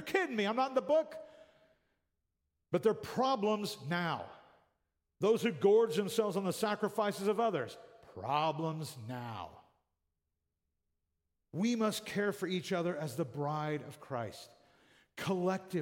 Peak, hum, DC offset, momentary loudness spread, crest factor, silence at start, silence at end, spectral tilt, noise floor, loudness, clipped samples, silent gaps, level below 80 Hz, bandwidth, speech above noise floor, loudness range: -16 dBFS; none; under 0.1%; 14 LU; 20 dB; 0 s; 0 s; -5.5 dB/octave; -87 dBFS; -34 LUFS; under 0.1%; none; -78 dBFS; 16.5 kHz; 53 dB; 8 LU